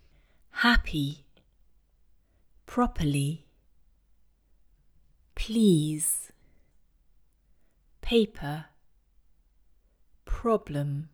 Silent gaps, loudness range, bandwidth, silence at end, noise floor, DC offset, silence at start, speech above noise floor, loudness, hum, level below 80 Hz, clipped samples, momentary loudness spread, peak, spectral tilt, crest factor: none; 5 LU; over 20 kHz; 0.05 s; -63 dBFS; under 0.1%; 0.55 s; 37 dB; -27 LUFS; none; -42 dBFS; under 0.1%; 17 LU; -8 dBFS; -4.5 dB/octave; 24 dB